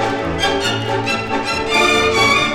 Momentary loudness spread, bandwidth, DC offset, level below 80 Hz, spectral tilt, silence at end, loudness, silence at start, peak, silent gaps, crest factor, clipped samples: 7 LU; 18 kHz; under 0.1%; -38 dBFS; -3.5 dB/octave; 0 s; -15 LUFS; 0 s; -2 dBFS; none; 14 dB; under 0.1%